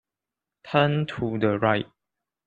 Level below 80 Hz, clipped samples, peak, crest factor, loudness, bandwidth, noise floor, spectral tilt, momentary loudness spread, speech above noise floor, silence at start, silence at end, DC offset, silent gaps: -60 dBFS; under 0.1%; -4 dBFS; 22 dB; -24 LUFS; 7.4 kHz; -88 dBFS; -8 dB/octave; 6 LU; 65 dB; 0.65 s; 0.6 s; under 0.1%; none